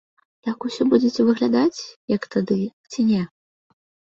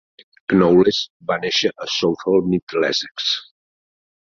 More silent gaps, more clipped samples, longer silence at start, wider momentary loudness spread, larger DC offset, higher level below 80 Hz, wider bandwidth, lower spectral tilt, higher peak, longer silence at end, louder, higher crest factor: about the same, 1.96-2.08 s, 2.73-2.84 s vs 1.10-1.20 s, 2.62-2.67 s, 3.11-3.15 s; neither; about the same, 0.45 s vs 0.5 s; first, 12 LU vs 9 LU; neither; second, -62 dBFS vs -54 dBFS; about the same, 7.6 kHz vs 7.4 kHz; first, -6.5 dB/octave vs -5 dB/octave; about the same, -4 dBFS vs -2 dBFS; about the same, 0.9 s vs 0.9 s; about the same, -21 LUFS vs -19 LUFS; about the same, 18 dB vs 18 dB